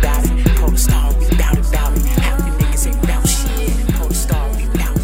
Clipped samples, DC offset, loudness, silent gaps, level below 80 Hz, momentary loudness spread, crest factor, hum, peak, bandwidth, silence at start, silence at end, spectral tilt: under 0.1%; 0.2%; -17 LUFS; none; -14 dBFS; 4 LU; 14 dB; none; 0 dBFS; 16.5 kHz; 0 s; 0 s; -5 dB/octave